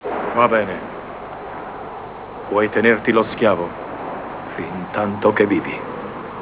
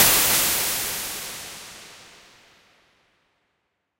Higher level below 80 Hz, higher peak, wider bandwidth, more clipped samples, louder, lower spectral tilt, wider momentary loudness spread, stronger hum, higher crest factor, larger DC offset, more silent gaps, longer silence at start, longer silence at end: about the same, -50 dBFS vs -52 dBFS; about the same, -2 dBFS vs -2 dBFS; second, 4 kHz vs 16 kHz; neither; about the same, -20 LUFS vs -20 LUFS; first, -10 dB/octave vs 0 dB/octave; second, 16 LU vs 24 LU; neither; about the same, 20 dB vs 24 dB; neither; neither; about the same, 0 s vs 0 s; second, 0 s vs 1.95 s